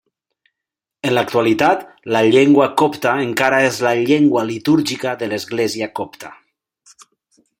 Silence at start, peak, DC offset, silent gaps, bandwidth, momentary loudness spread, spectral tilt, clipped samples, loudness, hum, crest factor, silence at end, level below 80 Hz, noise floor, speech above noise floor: 1.05 s; 0 dBFS; under 0.1%; none; 16.5 kHz; 12 LU; -5 dB/octave; under 0.1%; -16 LUFS; none; 18 dB; 1.3 s; -60 dBFS; -85 dBFS; 69 dB